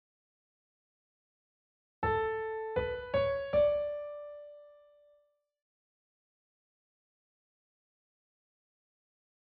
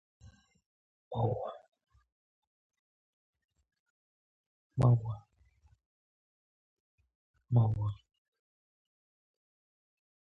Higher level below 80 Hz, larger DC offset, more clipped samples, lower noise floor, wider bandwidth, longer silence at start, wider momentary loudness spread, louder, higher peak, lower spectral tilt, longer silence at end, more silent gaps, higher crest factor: about the same, -58 dBFS vs -60 dBFS; neither; neither; about the same, -71 dBFS vs -68 dBFS; first, 4.8 kHz vs 4.2 kHz; first, 2 s vs 0.25 s; about the same, 18 LU vs 16 LU; about the same, -33 LUFS vs -32 LUFS; about the same, -18 dBFS vs -16 dBFS; second, -4 dB/octave vs -10.5 dB/octave; first, 4.85 s vs 2.3 s; second, none vs 0.66-1.11 s, 1.68-1.72 s, 2.12-2.70 s, 2.79-3.33 s, 3.80-4.70 s, 5.86-6.98 s, 7.15-7.34 s; about the same, 20 dB vs 22 dB